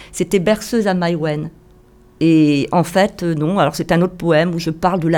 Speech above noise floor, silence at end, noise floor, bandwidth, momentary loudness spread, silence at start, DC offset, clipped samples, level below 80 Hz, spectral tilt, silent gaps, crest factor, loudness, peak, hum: 31 dB; 0 s; -47 dBFS; 18 kHz; 6 LU; 0 s; under 0.1%; under 0.1%; -44 dBFS; -6 dB/octave; none; 14 dB; -16 LUFS; -2 dBFS; none